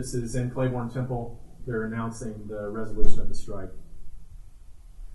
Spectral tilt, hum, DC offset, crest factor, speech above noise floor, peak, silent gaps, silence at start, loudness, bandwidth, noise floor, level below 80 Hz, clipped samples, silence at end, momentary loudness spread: -6.5 dB/octave; none; under 0.1%; 18 dB; 24 dB; -2 dBFS; none; 0 s; -32 LUFS; 11 kHz; -44 dBFS; -34 dBFS; under 0.1%; 0 s; 23 LU